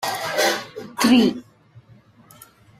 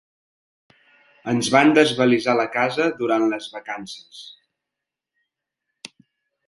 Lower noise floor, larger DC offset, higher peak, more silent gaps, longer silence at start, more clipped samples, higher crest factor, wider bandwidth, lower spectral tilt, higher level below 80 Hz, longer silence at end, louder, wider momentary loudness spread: second, -51 dBFS vs -85 dBFS; neither; second, -6 dBFS vs 0 dBFS; neither; second, 0 s vs 1.25 s; neither; about the same, 18 dB vs 22 dB; first, 16 kHz vs 11.5 kHz; about the same, -3.5 dB/octave vs -4.5 dB/octave; first, -60 dBFS vs -68 dBFS; second, 1.4 s vs 2.15 s; about the same, -19 LUFS vs -19 LUFS; second, 17 LU vs 25 LU